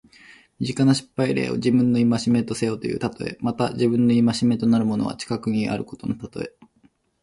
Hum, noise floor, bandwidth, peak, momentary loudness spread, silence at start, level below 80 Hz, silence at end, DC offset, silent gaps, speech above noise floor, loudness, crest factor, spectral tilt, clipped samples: none; -61 dBFS; 11.5 kHz; -8 dBFS; 11 LU; 0.6 s; -56 dBFS; 0.75 s; under 0.1%; none; 39 dB; -22 LUFS; 14 dB; -6.5 dB/octave; under 0.1%